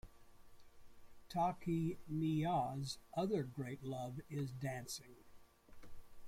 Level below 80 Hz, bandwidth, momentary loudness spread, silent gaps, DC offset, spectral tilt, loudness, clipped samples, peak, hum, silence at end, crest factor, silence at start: -66 dBFS; 16.5 kHz; 9 LU; none; under 0.1%; -6.5 dB/octave; -42 LUFS; under 0.1%; -26 dBFS; none; 0 s; 16 dB; 0.05 s